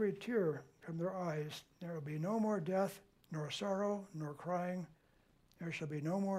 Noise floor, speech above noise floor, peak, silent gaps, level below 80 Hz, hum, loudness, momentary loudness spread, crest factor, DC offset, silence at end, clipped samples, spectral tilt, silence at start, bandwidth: -71 dBFS; 32 dB; -24 dBFS; none; -78 dBFS; none; -40 LUFS; 11 LU; 16 dB; under 0.1%; 0 s; under 0.1%; -6.5 dB/octave; 0 s; 15.5 kHz